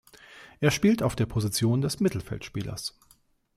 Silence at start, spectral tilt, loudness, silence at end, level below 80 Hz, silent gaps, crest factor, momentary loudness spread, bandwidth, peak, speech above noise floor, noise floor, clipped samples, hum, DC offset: 0.3 s; -5.5 dB/octave; -27 LUFS; 0.7 s; -52 dBFS; none; 20 dB; 12 LU; 16 kHz; -8 dBFS; 37 dB; -63 dBFS; under 0.1%; none; under 0.1%